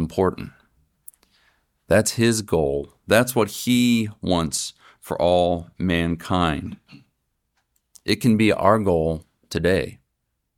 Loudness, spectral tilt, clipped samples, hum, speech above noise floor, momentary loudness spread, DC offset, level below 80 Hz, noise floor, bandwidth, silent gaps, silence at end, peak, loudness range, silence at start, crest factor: -21 LUFS; -5 dB/octave; under 0.1%; none; 55 dB; 13 LU; under 0.1%; -44 dBFS; -76 dBFS; 18.5 kHz; none; 0.65 s; -2 dBFS; 3 LU; 0 s; 20 dB